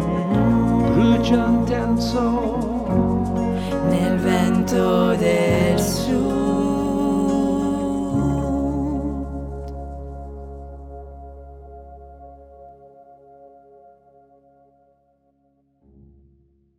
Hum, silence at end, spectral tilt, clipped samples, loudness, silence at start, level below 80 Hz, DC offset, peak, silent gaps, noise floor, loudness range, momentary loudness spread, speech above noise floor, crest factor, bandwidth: none; 3.3 s; -7 dB/octave; under 0.1%; -20 LUFS; 0 s; -36 dBFS; under 0.1%; -4 dBFS; none; -63 dBFS; 19 LU; 20 LU; 45 dB; 16 dB; 16.5 kHz